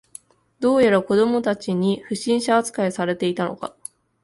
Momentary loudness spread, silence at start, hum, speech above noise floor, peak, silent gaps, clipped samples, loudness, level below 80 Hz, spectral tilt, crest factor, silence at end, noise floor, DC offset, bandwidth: 13 LU; 0.6 s; none; 27 dB; -6 dBFS; none; under 0.1%; -21 LUFS; -62 dBFS; -5.5 dB/octave; 16 dB; 0.55 s; -47 dBFS; under 0.1%; 11.5 kHz